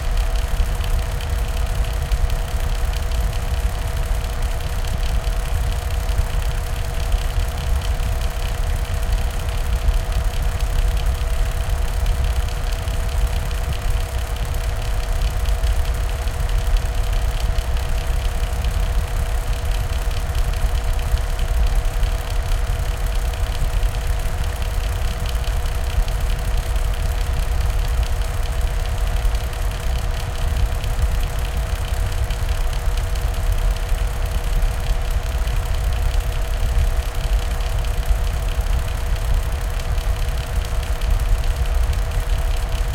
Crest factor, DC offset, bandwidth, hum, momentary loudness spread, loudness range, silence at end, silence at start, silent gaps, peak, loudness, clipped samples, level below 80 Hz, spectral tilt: 14 dB; under 0.1%; 17 kHz; none; 2 LU; 1 LU; 0 s; 0 s; none; -6 dBFS; -24 LUFS; under 0.1%; -20 dBFS; -4.5 dB/octave